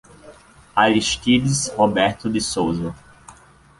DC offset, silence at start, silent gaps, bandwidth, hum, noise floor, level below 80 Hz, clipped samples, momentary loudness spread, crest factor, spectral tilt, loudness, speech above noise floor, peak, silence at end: under 0.1%; 0.25 s; none; 11.5 kHz; none; -48 dBFS; -46 dBFS; under 0.1%; 7 LU; 20 dB; -4 dB/octave; -19 LUFS; 29 dB; -2 dBFS; 0.45 s